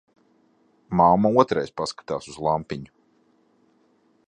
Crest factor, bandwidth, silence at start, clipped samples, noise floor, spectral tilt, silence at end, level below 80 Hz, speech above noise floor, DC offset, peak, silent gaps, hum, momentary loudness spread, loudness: 22 dB; 10 kHz; 0.9 s; under 0.1%; -63 dBFS; -6.5 dB/octave; 1.4 s; -54 dBFS; 41 dB; under 0.1%; -2 dBFS; none; none; 14 LU; -22 LUFS